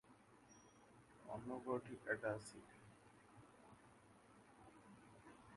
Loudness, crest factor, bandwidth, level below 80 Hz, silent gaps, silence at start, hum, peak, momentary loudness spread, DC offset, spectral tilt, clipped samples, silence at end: -48 LUFS; 26 dB; 11.5 kHz; -80 dBFS; none; 0.05 s; none; -28 dBFS; 22 LU; under 0.1%; -5.5 dB/octave; under 0.1%; 0 s